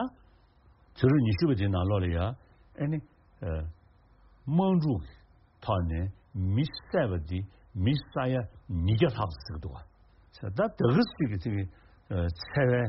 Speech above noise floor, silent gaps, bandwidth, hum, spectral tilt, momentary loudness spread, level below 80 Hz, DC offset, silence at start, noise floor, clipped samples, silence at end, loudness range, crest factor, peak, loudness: 32 dB; none; 5.8 kHz; none; -7 dB/octave; 15 LU; -46 dBFS; under 0.1%; 0 s; -60 dBFS; under 0.1%; 0 s; 3 LU; 20 dB; -10 dBFS; -30 LUFS